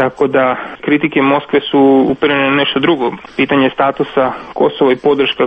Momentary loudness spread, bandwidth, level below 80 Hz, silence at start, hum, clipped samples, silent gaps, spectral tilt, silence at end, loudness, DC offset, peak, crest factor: 6 LU; 5.4 kHz; -48 dBFS; 0 s; none; under 0.1%; none; -7.5 dB/octave; 0 s; -13 LUFS; under 0.1%; 0 dBFS; 12 dB